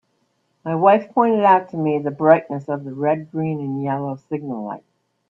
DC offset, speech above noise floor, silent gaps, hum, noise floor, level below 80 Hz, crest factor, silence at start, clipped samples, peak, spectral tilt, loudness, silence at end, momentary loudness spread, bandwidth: under 0.1%; 48 dB; none; none; -67 dBFS; -68 dBFS; 20 dB; 0.65 s; under 0.1%; 0 dBFS; -9.5 dB/octave; -19 LUFS; 0.5 s; 13 LU; 5.8 kHz